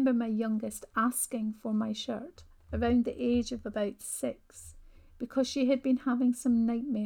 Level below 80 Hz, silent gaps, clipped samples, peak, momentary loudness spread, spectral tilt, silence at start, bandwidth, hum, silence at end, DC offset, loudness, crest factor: -52 dBFS; none; under 0.1%; -16 dBFS; 12 LU; -4.5 dB/octave; 0 s; 17.5 kHz; none; 0 s; under 0.1%; -31 LUFS; 14 dB